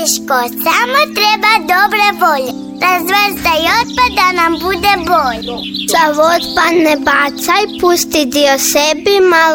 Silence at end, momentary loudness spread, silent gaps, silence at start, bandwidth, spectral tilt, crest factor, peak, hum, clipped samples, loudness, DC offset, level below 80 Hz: 0 s; 4 LU; none; 0 s; 17.5 kHz; -2 dB/octave; 12 dB; 0 dBFS; none; under 0.1%; -11 LUFS; under 0.1%; -40 dBFS